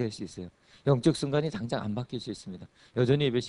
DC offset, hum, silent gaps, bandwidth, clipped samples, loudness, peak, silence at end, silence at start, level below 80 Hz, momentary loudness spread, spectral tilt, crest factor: under 0.1%; none; none; 11 kHz; under 0.1%; -29 LUFS; -10 dBFS; 0 s; 0 s; -60 dBFS; 19 LU; -6.5 dB/octave; 18 dB